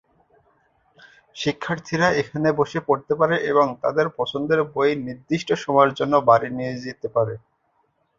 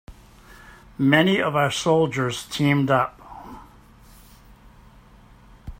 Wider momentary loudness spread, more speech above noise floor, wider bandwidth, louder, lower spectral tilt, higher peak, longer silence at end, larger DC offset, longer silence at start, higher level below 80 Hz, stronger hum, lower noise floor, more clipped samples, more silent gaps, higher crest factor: second, 10 LU vs 23 LU; first, 46 dB vs 29 dB; second, 7.6 kHz vs 16 kHz; about the same, -21 LUFS vs -21 LUFS; about the same, -6 dB/octave vs -5.5 dB/octave; about the same, -2 dBFS vs -2 dBFS; first, 0.8 s vs 0.05 s; neither; first, 1.35 s vs 0.1 s; second, -58 dBFS vs -50 dBFS; neither; first, -67 dBFS vs -50 dBFS; neither; neither; about the same, 20 dB vs 22 dB